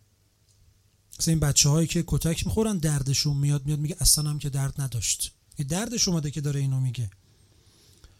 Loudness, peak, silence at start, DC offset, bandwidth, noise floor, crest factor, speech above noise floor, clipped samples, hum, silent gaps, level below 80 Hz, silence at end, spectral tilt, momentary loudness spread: -25 LUFS; -6 dBFS; 1.15 s; under 0.1%; 16 kHz; -64 dBFS; 22 dB; 39 dB; under 0.1%; none; none; -42 dBFS; 1.1 s; -4 dB/octave; 9 LU